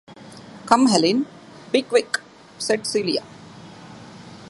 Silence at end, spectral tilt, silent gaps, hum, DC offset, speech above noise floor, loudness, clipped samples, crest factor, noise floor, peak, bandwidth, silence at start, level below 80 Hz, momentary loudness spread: 0 s; -3.5 dB/octave; none; none; under 0.1%; 23 dB; -21 LUFS; under 0.1%; 22 dB; -42 dBFS; 0 dBFS; 11.5 kHz; 0.1 s; -64 dBFS; 25 LU